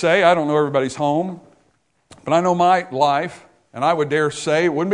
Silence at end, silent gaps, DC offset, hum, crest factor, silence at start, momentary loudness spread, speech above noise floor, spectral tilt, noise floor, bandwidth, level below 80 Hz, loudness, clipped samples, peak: 0 s; none; under 0.1%; none; 18 dB; 0 s; 14 LU; 45 dB; -5.5 dB/octave; -63 dBFS; 10.5 kHz; -60 dBFS; -18 LUFS; under 0.1%; 0 dBFS